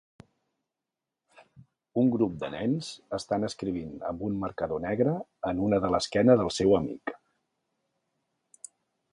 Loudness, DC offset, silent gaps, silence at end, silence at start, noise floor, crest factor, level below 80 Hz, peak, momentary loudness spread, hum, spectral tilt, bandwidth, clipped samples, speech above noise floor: -28 LUFS; under 0.1%; none; 1.95 s; 1.95 s; -88 dBFS; 22 dB; -56 dBFS; -8 dBFS; 14 LU; none; -6 dB/octave; 11 kHz; under 0.1%; 61 dB